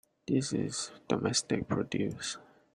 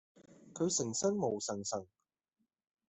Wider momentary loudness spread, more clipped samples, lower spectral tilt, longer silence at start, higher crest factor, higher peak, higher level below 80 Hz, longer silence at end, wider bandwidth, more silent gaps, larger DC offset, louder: about the same, 8 LU vs 9 LU; neither; about the same, -4.5 dB/octave vs -4 dB/octave; about the same, 0.3 s vs 0.3 s; about the same, 22 dB vs 18 dB; first, -12 dBFS vs -20 dBFS; first, -64 dBFS vs -78 dBFS; second, 0.3 s vs 1.05 s; first, 12.5 kHz vs 8.4 kHz; neither; neither; first, -33 LUFS vs -36 LUFS